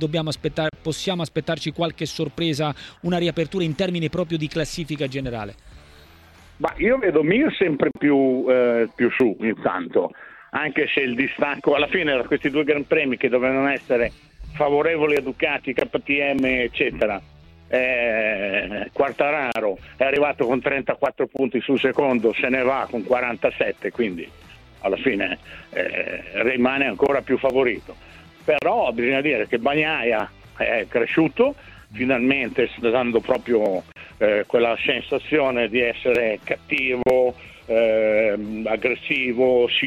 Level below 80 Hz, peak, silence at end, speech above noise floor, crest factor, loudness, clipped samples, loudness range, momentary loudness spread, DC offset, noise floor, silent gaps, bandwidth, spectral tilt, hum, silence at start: -50 dBFS; -6 dBFS; 0 s; 27 dB; 16 dB; -21 LUFS; under 0.1%; 4 LU; 8 LU; under 0.1%; -48 dBFS; none; 13 kHz; -6 dB/octave; none; 0 s